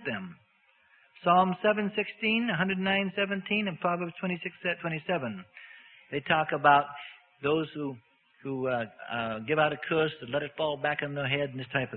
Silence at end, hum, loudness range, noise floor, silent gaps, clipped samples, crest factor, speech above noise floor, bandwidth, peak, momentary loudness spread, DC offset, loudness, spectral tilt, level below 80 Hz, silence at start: 0 s; none; 4 LU; -66 dBFS; none; under 0.1%; 20 dB; 37 dB; 4.5 kHz; -10 dBFS; 14 LU; under 0.1%; -29 LUFS; -9.5 dB/octave; -68 dBFS; 0 s